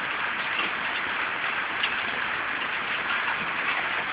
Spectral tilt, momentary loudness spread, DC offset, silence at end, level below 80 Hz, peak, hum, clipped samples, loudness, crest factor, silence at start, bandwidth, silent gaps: 1 dB/octave; 2 LU; under 0.1%; 0 s; -62 dBFS; -12 dBFS; none; under 0.1%; -26 LUFS; 18 dB; 0 s; 4 kHz; none